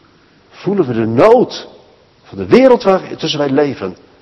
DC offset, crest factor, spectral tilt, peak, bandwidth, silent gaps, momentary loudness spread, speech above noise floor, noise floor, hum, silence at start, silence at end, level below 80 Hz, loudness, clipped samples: under 0.1%; 14 dB; -6.5 dB/octave; 0 dBFS; 8.2 kHz; none; 18 LU; 36 dB; -48 dBFS; none; 0.6 s; 0.25 s; -52 dBFS; -12 LUFS; 0.7%